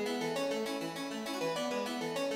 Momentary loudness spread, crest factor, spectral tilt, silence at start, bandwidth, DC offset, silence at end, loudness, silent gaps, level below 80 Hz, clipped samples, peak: 4 LU; 12 dB; -3.5 dB/octave; 0 s; 16 kHz; under 0.1%; 0 s; -36 LUFS; none; -76 dBFS; under 0.1%; -24 dBFS